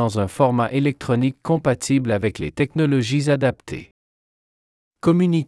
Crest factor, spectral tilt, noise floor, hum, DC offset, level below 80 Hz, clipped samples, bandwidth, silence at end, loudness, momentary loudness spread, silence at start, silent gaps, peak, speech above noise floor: 16 dB; -6.5 dB/octave; under -90 dBFS; none; under 0.1%; -52 dBFS; under 0.1%; 12 kHz; 0 s; -20 LUFS; 6 LU; 0 s; 3.91-4.91 s; -4 dBFS; over 71 dB